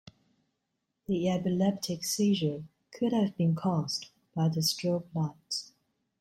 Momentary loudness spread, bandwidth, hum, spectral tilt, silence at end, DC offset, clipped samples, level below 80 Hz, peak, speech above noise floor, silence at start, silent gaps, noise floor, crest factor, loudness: 9 LU; 16.5 kHz; none; -5.5 dB/octave; 0.55 s; under 0.1%; under 0.1%; -68 dBFS; -16 dBFS; 53 dB; 1.1 s; none; -82 dBFS; 16 dB; -30 LUFS